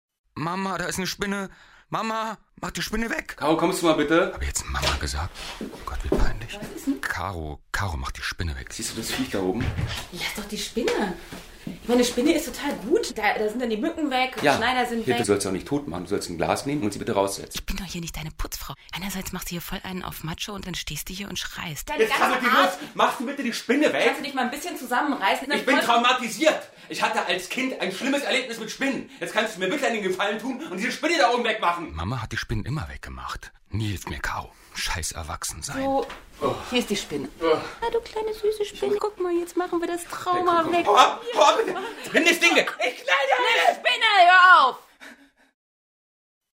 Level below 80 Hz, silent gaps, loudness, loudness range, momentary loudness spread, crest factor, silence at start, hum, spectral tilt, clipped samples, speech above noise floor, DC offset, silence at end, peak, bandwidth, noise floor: -40 dBFS; none; -24 LUFS; 10 LU; 13 LU; 22 dB; 0.35 s; none; -3.5 dB/octave; under 0.1%; 25 dB; under 0.1%; 1.4 s; -2 dBFS; 16 kHz; -49 dBFS